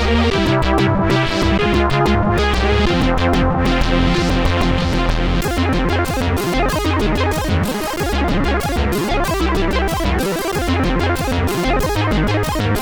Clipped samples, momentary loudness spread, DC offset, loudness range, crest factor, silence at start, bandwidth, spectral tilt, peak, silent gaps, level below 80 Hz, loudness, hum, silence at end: under 0.1%; 3 LU; under 0.1%; 3 LU; 14 dB; 0 s; over 20 kHz; -5.5 dB/octave; -2 dBFS; none; -22 dBFS; -17 LUFS; none; 0 s